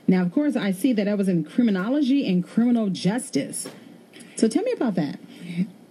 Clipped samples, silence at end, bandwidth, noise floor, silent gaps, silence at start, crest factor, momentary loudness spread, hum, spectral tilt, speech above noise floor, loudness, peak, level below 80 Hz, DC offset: under 0.1%; 0.2 s; 14 kHz; -46 dBFS; none; 0.1 s; 18 dB; 10 LU; none; -6 dB/octave; 23 dB; -23 LUFS; -6 dBFS; -78 dBFS; under 0.1%